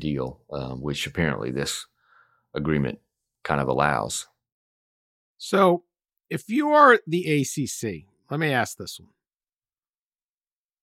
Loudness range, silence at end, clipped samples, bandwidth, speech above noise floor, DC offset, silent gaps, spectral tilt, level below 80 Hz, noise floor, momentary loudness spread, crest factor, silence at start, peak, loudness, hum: 7 LU; 1.85 s; under 0.1%; 16 kHz; over 67 dB; under 0.1%; 4.52-5.36 s; -5 dB/octave; -52 dBFS; under -90 dBFS; 18 LU; 22 dB; 0 s; -4 dBFS; -24 LUFS; none